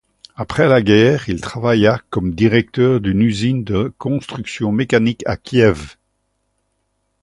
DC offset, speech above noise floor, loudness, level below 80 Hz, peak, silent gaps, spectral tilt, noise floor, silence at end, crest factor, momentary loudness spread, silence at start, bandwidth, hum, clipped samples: under 0.1%; 53 dB; -16 LUFS; -40 dBFS; 0 dBFS; none; -7 dB/octave; -68 dBFS; 1.3 s; 16 dB; 11 LU; 0.4 s; 11.5 kHz; none; under 0.1%